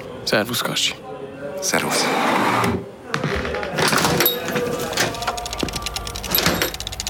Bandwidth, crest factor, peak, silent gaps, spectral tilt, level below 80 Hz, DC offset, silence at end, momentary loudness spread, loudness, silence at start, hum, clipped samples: over 20 kHz; 22 dB; 0 dBFS; none; -3 dB/octave; -40 dBFS; under 0.1%; 0 s; 9 LU; -20 LUFS; 0 s; none; under 0.1%